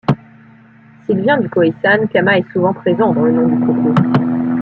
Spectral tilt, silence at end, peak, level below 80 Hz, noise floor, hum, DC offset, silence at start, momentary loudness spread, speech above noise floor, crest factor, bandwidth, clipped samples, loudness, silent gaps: -9 dB/octave; 0 s; -2 dBFS; -54 dBFS; -43 dBFS; none; under 0.1%; 0.1 s; 5 LU; 30 dB; 14 dB; 5.4 kHz; under 0.1%; -14 LUFS; none